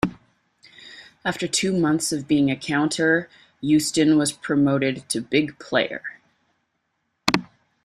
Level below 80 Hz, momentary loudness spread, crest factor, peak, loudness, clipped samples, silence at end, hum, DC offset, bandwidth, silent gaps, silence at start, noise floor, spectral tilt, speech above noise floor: -56 dBFS; 12 LU; 24 dB; 0 dBFS; -22 LUFS; under 0.1%; 0.4 s; none; under 0.1%; 14 kHz; none; 0.05 s; -74 dBFS; -4 dB/octave; 53 dB